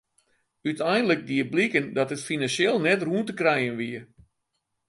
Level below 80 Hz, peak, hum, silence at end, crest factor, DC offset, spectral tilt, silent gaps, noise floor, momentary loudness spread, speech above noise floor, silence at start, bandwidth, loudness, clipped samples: -68 dBFS; -6 dBFS; none; 0.85 s; 20 dB; under 0.1%; -5 dB/octave; none; -78 dBFS; 10 LU; 54 dB; 0.65 s; 11.5 kHz; -25 LUFS; under 0.1%